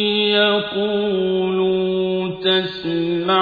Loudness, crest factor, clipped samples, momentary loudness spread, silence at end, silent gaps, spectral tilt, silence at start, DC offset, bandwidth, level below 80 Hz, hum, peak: -19 LUFS; 14 dB; under 0.1%; 6 LU; 0 s; none; -7.5 dB/octave; 0 s; under 0.1%; 5 kHz; -56 dBFS; none; -4 dBFS